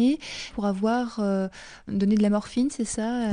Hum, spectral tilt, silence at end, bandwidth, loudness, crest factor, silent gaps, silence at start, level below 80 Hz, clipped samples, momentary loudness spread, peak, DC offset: none; -5.5 dB/octave; 0 s; 10 kHz; -26 LUFS; 14 dB; none; 0 s; -52 dBFS; under 0.1%; 10 LU; -12 dBFS; under 0.1%